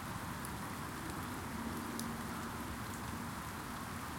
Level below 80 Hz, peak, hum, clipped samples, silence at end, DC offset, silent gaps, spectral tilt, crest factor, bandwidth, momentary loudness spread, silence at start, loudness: -56 dBFS; -22 dBFS; none; under 0.1%; 0 s; under 0.1%; none; -4.5 dB/octave; 22 dB; 17 kHz; 2 LU; 0 s; -43 LUFS